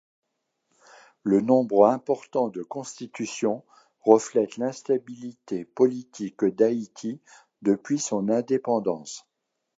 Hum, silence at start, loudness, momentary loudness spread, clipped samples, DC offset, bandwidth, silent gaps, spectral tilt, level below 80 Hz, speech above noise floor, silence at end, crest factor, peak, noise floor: none; 1.25 s; -25 LUFS; 15 LU; under 0.1%; under 0.1%; 8 kHz; none; -5.5 dB/octave; -74 dBFS; 52 dB; 0.6 s; 24 dB; -2 dBFS; -77 dBFS